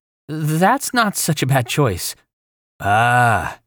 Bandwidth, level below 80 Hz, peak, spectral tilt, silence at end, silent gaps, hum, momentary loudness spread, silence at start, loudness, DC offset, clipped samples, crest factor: over 20 kHz; -48 dBFS; -4 dBFS; -4.5 dB/octave; 0.1 s; 2.33-2.79 s; none; 12 LU; 0.3 s; -17 LUFS; under 0.1%; under 0.1%; 14 dB